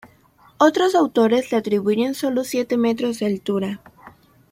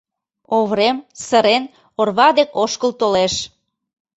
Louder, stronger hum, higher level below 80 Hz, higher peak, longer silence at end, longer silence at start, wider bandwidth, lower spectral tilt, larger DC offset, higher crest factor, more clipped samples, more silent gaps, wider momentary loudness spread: second, -20 LUFS vs -17 LUFS; neither; second, -62 dBFS vs -54 dBFS; about the same, -2 dBFS vs -2 dBFS; second, 0.4 s vs 0.7 s; second, 0.05 s vs 0.5 s; first, 16.5 kHz vs 8.2 kHz; first, -5.5 dB/octave vs -3.5 dB/octave; neither; about the same, 18 dB vs 16 dB; neither; neither; second, 7 LU vs 10 LU